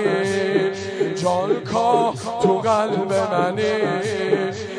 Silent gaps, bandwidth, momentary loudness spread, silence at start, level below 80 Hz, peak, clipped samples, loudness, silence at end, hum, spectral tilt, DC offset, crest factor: none; 10.5 kHz; 4 LU; 0 s; -60 dBFS; -4 dBFS; under 0.1%; -20 LUFS; 0 s; none; -5.5 dB/octave; under 0.1%; 16 dB